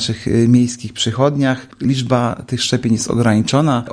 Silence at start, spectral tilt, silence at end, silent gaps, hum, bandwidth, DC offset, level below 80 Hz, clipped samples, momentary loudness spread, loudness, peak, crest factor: 0 s; -5.5 dB/octave; 0 s; none; none; 10.5 kHz; under 0.1%; -44 dBFS; under 0.1%; 7 LU; -16 LUFS; -2 dBFS; 14 dB